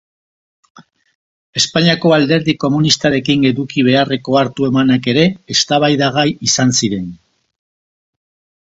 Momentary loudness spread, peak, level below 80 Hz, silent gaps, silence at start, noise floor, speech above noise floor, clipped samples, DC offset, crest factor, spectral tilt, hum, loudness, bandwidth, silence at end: 3 LU; 0 dBFS; -50 dBFS; 1.15-1.53 s; 0.8 s; under -90 dBFS; over 77 dB; under 0.1%; under 0.1%; 16 dB; -4.5 dB/octave; none; -13 LUFS; 8 kHz; 1.5 s